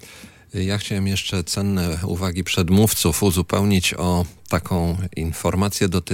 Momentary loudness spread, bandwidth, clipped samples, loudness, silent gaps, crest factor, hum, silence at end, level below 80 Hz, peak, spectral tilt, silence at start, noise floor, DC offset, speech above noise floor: 7 LU; 17 kHz; under 0.1%; -21 LUFS; none; 16 dB; none; 0 s; -42 dBFS; -4 dBFS; -5 dB/octave; 0.05 s; -43 dBFS; under 0.1%; 23 dB